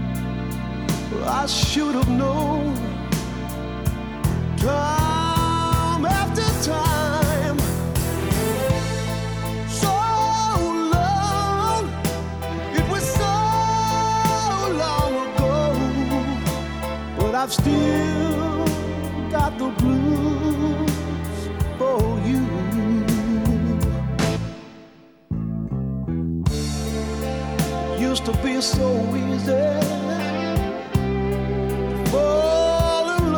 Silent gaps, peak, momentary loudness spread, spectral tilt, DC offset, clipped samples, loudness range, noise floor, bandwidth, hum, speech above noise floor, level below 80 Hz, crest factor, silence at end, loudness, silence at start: none; -6 dBFS; 7 LU; -5.5 dB/octave; under 0.1%; under 0.1%; 3 LU; -48 dBFS; over 20 kHz; none; 28 dB; -32 dBFS; 16 dB; 0 s; -22 LUFS; 0 s